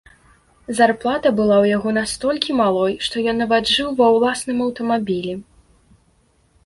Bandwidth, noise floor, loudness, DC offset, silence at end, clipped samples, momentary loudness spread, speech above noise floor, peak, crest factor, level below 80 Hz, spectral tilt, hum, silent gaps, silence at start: 11.5 kHz; -59 dBFS; -18 LUFS; under 0.1%; 1.25 s; under 0.1%; 7 LU; 41 dB; 0 dBFS; 18 dB; -52 dBFS; -4.5 dB/octave; none; none; 0.7 s